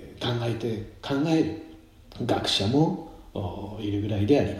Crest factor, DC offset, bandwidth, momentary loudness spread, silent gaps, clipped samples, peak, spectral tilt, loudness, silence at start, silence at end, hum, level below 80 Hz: 18 dB; under 0.1%; 14.5 kHz; 12 LU; none; under 0.1%; -8 dBFS; -6 dB/octave; -27 LUFS; 0 s; 0 s; none; -52 dBFS